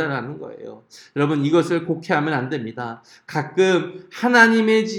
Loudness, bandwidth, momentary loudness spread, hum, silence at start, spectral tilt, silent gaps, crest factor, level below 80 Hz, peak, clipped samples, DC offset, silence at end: -19 LUFS; 13.5 kHz; 20 LU; none; 0 s; -5.5 dB/octave; none; 20 dB; -72 dBFS; 0 dBFS; under 0.1%; under 0.1%; 0 s